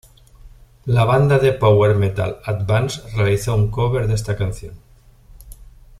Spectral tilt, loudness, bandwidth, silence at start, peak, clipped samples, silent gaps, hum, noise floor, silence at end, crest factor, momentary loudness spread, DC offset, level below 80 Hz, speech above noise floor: -6.5 dB/octave; -18 LUFS; 13.5 kHz; 0.45 s; -2 dBFS; under 0.1%; none; none; -47 dBFS; 0.35 s; 16 dB; 10 LU; under 0.1%; -38 dBFS; 30 dB